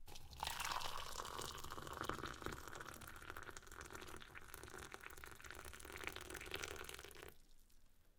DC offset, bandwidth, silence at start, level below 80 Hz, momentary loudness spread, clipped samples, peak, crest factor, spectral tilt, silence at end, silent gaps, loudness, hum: under 0.1%; 18 kHz; 0 s; -62 dBFS; 10 LU; under 0.1%; -24 dBFS; 26 dB; -2.5 dB/octave; 0.05 s; none; -50 LUFS; none